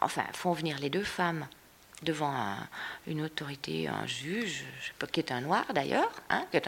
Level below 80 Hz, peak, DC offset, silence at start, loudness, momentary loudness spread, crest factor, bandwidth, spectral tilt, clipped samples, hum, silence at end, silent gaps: -66 dBFS; -10 dBFS; under 0.1%; 0 s; -33 LUFS; 8 LU; 24 dB; 17 kHz; -4.5 dB/octave; under 0.1%; none; 0 s; none